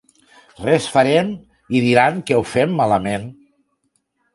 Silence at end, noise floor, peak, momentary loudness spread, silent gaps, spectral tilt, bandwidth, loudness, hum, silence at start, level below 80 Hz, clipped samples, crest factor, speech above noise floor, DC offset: 1 s; -68 dBFS; 0 dBFS; 12 LU; none; -5.5 dB/octave; 11.5 kHz; -17 LUFS; none; 0.6 s; -52 dBFS; under 0.1%; 18 dB; 51 dB; under 0.1%